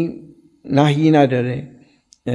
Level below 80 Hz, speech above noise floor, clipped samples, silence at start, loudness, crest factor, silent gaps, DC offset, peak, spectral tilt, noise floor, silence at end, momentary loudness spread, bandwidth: -58 dBFS; 36 dB; under 0.1%; 0 s; -16 LUFS; 16 dB; none; under 0.1%; -2 dBFS; -7.5 dB/octave; -51 dBFS; 0 s; 15 LU; 10.5 kHz